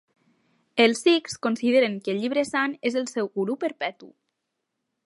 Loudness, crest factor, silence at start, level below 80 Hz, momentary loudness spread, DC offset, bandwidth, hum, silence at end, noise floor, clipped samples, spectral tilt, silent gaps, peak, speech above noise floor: -24 LUFS; 22 dB; 0.75 s; -74 dBFS; 8 LU; under 0.1%; 11.5 kHz; none; 0.95 s; -81 dBFS; under 0.1%; -4 dB/octave; none; -4 dBFS; 57 dB